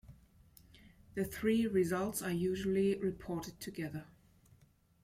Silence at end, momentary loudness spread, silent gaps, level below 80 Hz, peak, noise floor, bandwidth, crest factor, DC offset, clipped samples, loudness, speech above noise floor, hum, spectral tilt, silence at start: 0.95 s; 12 LU; none; -62 dBFS; -20 dBFS; -68 dBFS; 16.5 kHz; 16 dB; under 0.1%; under 0.1%; -36 LUFS; 32 dB; none; -6 dB/octave; 0.05 s